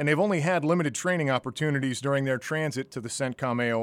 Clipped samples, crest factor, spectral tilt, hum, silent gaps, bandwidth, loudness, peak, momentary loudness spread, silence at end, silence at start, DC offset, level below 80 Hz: under 0.1%; 16 dB; -5.5 dB/octave; none; none; 15.5 kHz; -27 LUFS; -10 dBFS; 7 LU; 0 s; 0 s; under 0.1%; -70 dBFS